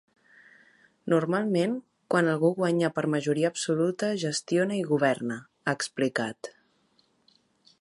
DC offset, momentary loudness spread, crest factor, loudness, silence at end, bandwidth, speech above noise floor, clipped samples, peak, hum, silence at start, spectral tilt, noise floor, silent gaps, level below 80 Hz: under 0.1%; 9 LU; 18 dB; -27 LUFS; 1.3 s; 11.5 kHz; 41 dB; under 0.1%; -10 dBFS; none; 1.05 s; -5.5 dB/octave; -68 dBFS; none; -76 dBFS